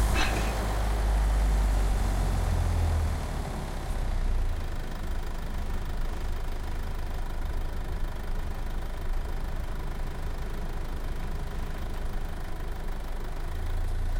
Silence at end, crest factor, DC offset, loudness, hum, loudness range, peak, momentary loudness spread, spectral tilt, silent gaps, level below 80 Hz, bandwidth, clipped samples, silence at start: 0 s; 16 dB; under 0.1%; -33 LUFS; none; 8 LU; -12 dBFS; 10 LU; -5.5 dB/octave; none; -30 dBFS; 16.5 kHz; under 0.1%; 0 s